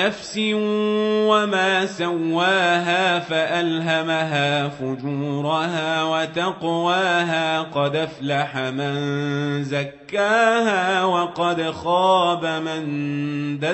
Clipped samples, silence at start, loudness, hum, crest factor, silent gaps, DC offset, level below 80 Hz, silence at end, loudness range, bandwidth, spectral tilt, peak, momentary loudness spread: under 0.1%; 0 s; -21 LUFS; none; 16 dB; none; under 0.1%; -64 dBFS; 0 s; 3 LU; 8.4 kHz; -5 dB/octave; -6 dBFS; 8 LU